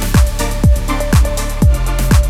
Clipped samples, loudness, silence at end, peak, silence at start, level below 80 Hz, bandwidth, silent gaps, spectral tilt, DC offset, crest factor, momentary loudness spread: under 0.1%; -14 LUFS; 0 s; 0 dBFS; 0 s; -14 dBFS; 16 kHz; none; -5.5 dB/octave; under 0.1%; 12 dB; 3 LU